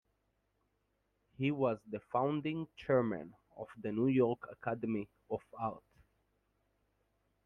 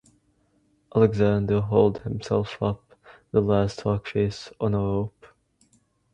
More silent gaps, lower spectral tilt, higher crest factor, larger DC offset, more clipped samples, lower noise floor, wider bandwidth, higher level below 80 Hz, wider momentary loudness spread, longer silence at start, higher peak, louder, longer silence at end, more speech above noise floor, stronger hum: neither; first, -9.5 dB/octave vs -8 dB/octave; about the same, 18 dB vs 20 dB; neither; neither; first, -80 dBFS vs -66 dBFS; second, 5.8 kHz vs 9.4 kHz; second, -72 dBFS vs -48 dBFS; first, 12 LU vs 9 LU; first, 1.4 s vs 0.95 s; second, -20 dBFS vs -4 dBFS; second, -36 LUFS vs -24 LUFS; first, 1.65 s vs 1.05 s; about the same, 44 dB vs 43 dB; neither